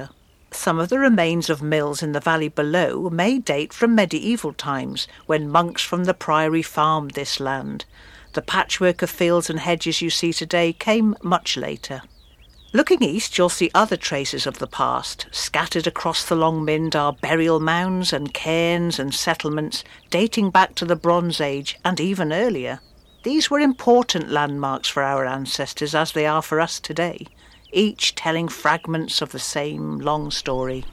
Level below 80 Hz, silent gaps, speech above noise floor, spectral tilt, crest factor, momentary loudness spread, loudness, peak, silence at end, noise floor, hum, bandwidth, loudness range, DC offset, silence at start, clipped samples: -50 dBFS; none; 28 dB; -4 dB/octave; 20 dB; 8 LU; -21 LUFS; -2 dBFS; 0 s; -49 dBFS; none; 16 kHz; 2 LU; under 0.1%; 0 s; under 0.1%